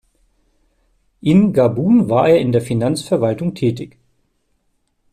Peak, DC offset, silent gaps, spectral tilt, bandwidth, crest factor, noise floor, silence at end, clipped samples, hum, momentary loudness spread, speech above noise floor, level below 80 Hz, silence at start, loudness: -2 dBFS; under 0.1%; none; -7.5 dB/octave; 13.5 kHz; 14 dB; -65 dBFS; 1.25 s; under 0.1%; none; 8 LU; 51 dB; -52 dBFS; 1.25 s; -16 LUFS